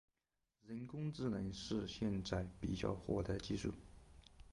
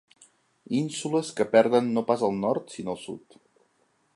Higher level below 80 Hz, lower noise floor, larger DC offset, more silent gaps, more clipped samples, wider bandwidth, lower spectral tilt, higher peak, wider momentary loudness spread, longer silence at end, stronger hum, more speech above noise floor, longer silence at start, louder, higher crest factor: first, -58 dBFS vs -70 dBFS; first, -89 dBFS vs -69 dBFS; neither; neither; neither; about the same, 11.5 kHz vs 11.5 kHz; about the same, -6.5 dB/octave vs -5.5 dB/octave; second, -26 dBFS vs -6 dBFS; about the same, 14 LU vs 14 LU; second, 0.05 s vs 0.95 s; neither; first, 47 dB vs 43 dB; about the same, 0.65 s vs 0.7 s; second, -43 LUFS vs -26 LUFS; about the same, 18 dB vs 22 dB